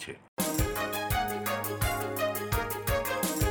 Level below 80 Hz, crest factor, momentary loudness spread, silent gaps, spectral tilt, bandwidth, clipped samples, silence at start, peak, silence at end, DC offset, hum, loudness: -40 dBFS; 16 dB; 3 LU; 0.28-0.37 s; -4 dB/octave; over 20 kHz; under 0.1%; 0 s; -14 dBFS; 0 s; under 0.1%; none; -31 LUFS